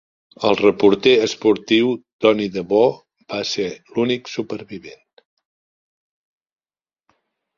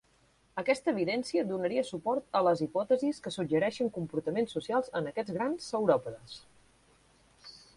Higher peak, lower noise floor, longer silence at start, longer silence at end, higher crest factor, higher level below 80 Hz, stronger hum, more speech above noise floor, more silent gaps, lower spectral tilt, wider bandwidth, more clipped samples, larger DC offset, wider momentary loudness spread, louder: first, -2 dBFS vs -12 dBFS; first, under -90 dBFS vs -67 dBFS; second, 0.4 s vs 0.55 s; first, 2.65 s vs 0.2 s; about the same, 18 dB vs 20 dB; first, -60 dBFS vs -68 dBFS; neither; first, over 72 dB vs 36 dB; first, 2.13-2.19 s vs none; about the same, -5 dB/octave vs -6 dB/octave; second, 7.4 kHz vs 11.5 kHz; neither; neither; first, 15 LU vs 12 LU; first, -18 LUFS vs -31 LUFS